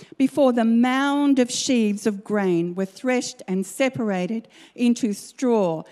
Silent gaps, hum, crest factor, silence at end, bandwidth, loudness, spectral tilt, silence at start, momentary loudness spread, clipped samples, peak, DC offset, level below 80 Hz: none; none; 16 dB; 0.1 s; 13.5 kHz; -22 LUFS; -5 dB/octave; 0 s; 8 LU; under 0.1%; -6 dBFS; under 0.1%; -72 dBFS